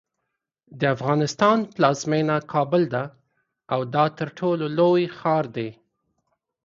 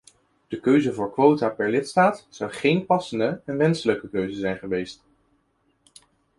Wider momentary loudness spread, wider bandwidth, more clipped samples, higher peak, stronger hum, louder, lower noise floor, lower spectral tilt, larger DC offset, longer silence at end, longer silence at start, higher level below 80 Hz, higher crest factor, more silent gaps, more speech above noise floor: about the same, 9 LU vs 10 LU; second, 7.6 kHz vs 11.5 kHz; neither; about the same, -4 dBFS vs -4 dBFS; neither; about the same, -22 LUFS vs -23 LUFS; first, -80 dBFS vs -68 dBFS; about the same, -6 dB/octave vs -6.5 dB/octave; neither; second, 0.9 s vs 1.45 s; first, 0.7 s vs 0.5 s; second, -66 dBFS vs -60 dBFS; about the same, 20 dB vs 20 dB; neither; first, 59 dB vs 45 dB